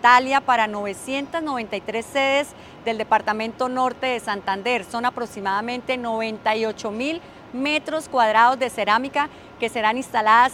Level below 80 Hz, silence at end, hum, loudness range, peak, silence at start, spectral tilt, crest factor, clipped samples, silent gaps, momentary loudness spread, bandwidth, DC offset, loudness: -60 dBFS; 0 s; none; 3 LU; -2 dBFS; 0 s; -3.5 dB/octave; 20 dB; under 0.1%; none; 11 LU; 16 kHz; under 0.1%; -22 LUFS